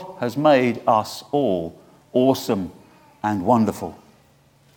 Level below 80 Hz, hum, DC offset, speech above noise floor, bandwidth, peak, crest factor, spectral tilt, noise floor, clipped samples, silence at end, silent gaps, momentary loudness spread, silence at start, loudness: -60 dBFS; none; under 0.1%; 36 dB; 19 kHz; -4 dBFS; 18 dB; -6 dB/octave; -56 dBFS; under 0.1%; 0.8 s; none; 14 LU; 0 s; -21 LUFS